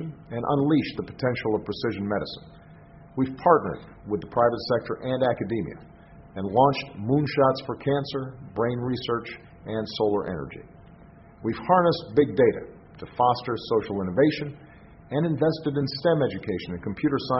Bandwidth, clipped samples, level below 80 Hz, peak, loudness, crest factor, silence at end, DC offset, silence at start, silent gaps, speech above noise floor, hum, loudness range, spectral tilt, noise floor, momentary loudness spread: 6 kHz; under 0.1%; -54 dBFS; -4 dBFS; -25 LUFS; 22 dB; 0 s; under 0.1%; 0 s; none; 24 dB; none; 3 LU; -5.5 dB/octave; -49 dBFS; 15 LU